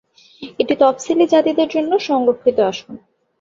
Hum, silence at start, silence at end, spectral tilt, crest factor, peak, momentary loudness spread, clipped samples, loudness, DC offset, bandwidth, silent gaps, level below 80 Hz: none; 0.4 s; 0.45 s; -4.5 dB/octave; 16 dB; -2 dBFS; 12 LU; under 0.1%; -16 LUFS; under 0.1%; 7.6 kHz; none; -60 dBFS